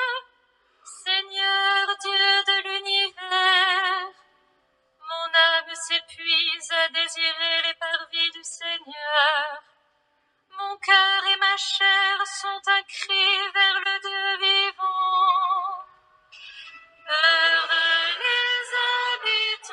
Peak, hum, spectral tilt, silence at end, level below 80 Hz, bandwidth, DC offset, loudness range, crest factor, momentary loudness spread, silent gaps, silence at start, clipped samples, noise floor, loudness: -6 dBFS; none; 3 dB/octave; 0 s; -84 dBFS; 11.5 kHz; under 0.1%; 3 LU; 18 dB; 12 LU; none; 0 s; under 0.1%; -68 dBFS; -21 LUFS